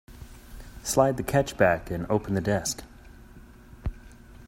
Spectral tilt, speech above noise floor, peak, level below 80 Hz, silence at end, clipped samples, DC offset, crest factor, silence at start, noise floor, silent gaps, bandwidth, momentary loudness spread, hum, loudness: -5 dB/octave; 24 dB; -6 dBFS; -44 dBFS; 0 s; under 0.1%; under 0.1%; 22 dB; 0.1 s; -49 dBFS; none; 16 kHz; 23 LU; none; -26 LUFS